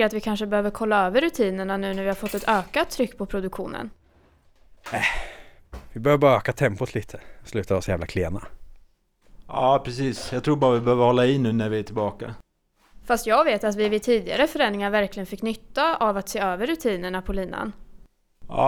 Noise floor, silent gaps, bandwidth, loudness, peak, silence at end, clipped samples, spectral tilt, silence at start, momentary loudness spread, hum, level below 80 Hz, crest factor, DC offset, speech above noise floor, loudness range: -61 dBFS; none; over 20 kHz; -24 LUFS; -6 dBFS; 0 s; under 0.1%; -5.5 dB/octave; 0 s; 13 LU; none; -44 dBFS; 18 dB; under 0.1%; 37 dB; 5 LU